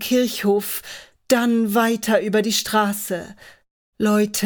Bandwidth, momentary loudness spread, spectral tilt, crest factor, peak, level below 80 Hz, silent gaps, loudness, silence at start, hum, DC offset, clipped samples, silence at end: over 20 kHz; 11 LU; -4 dB/octave; 18 dB; -4 dBFS; -60 dBFS; 3.71-3.93 s; -20 LUFS; 0 s; none; under 0.1%; under 0.1%; 0 s